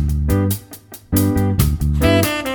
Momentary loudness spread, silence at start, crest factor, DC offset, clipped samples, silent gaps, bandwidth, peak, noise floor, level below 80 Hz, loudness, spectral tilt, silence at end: 11 LU; 0 s; 16 dB; under 0.1%; under 0.1%; none; over 20 kHz; 0 dBFS; -39 dBFS; -24 dBFS; -17 LUFS; -6 dB/octave; 0 s